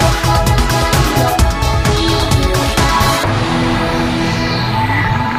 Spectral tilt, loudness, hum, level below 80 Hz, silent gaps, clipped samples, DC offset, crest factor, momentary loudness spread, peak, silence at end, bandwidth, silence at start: -4.5 dB/octave; -13 LUFS; none; -20 dBFS; none; under 0.1%; under 0.1%; 12 dB; 3 LU; 0 dBFS; 0 s; 15.5 kHz; 0 s